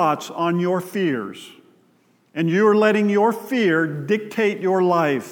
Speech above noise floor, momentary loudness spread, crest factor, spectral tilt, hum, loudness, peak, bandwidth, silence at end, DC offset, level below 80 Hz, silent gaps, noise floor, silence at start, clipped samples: 40 dB; 8 LU; 18 dB; -6.5 dB/octave; none; -20 LUFS; -2 dBFS; 18.5 kHz; 0 s; under 0.1%; -82 dBFS; none; -60 dBFS; 0 s; under 0.1%